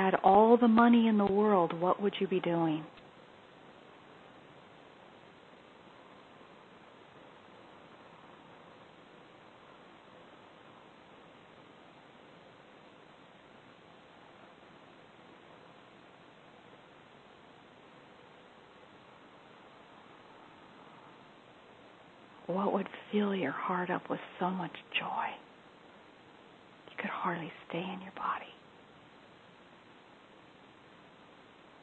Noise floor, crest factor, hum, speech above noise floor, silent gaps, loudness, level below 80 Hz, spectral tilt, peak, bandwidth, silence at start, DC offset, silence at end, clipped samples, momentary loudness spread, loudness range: -58 dBFS; 24 dB; none; 28 dB; none; -30 LUFS; -74 dBFS; -8 dB/octave; -12 dBFS; 8 kHz; 0 s; under 0.1%; 3.3 s; under 0.1%; 28 LU; 22 LU